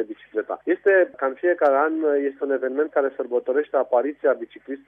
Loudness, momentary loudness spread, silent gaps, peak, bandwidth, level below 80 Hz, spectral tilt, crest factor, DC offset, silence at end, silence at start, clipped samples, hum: -22 LUFS; 9 LU; none; -6 dBFS; 3.8 kHz; -76 dBFS; -6.5 dB/octave; 16 dB; under 0.1%; 0.1 s; 0 s; under 0.1%; none